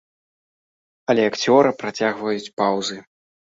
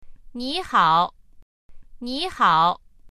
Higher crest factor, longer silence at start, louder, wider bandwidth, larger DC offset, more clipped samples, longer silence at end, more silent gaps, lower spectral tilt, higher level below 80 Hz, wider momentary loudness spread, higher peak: about the same, 20 dB vs 18 dB; first, 1.1 s vs 0.05 s; about the same, -20 LUFS vs -21 LUFS; second, 7.8 kHz vs 13.5 kHz; neither; neither; first, 0.5 s vs 0.05 s; second, 2.53-2.57 s vs 1.42-1.69 s; about the same, -4.5 dB/octave vs -4.5 dB/octave; second, -66 dBFS vs -48 dBFS; second, 12 LU vs 17 LU; first, -2 dBFS vs -6 dBFS